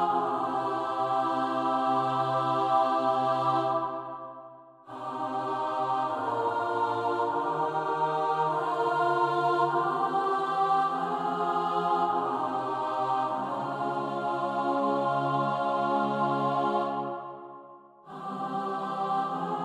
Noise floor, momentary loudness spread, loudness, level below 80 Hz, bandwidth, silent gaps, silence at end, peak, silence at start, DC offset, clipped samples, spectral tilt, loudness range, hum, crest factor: -50 dBFS; 9 LU; -28 LUFS; -76 dBFS; 11.5 kHz; none; 0 s; -14 dBFS; 0 s; under 0.1%; under 0.1%; -6.5 dB/octave; 4 LU; none; 14 dB